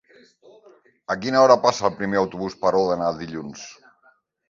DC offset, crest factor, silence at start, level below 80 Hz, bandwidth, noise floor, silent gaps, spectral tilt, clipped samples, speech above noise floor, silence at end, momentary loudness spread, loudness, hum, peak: under 0.1%; 22 dB; 1.1 s; -58 dBFS; 7.6 kHz; -60 dBFS; none; -5 dB/octave; under 0.1%; 40 dB; 0.75 s; 21 LU; -21 LUFS; none; -2 dBFS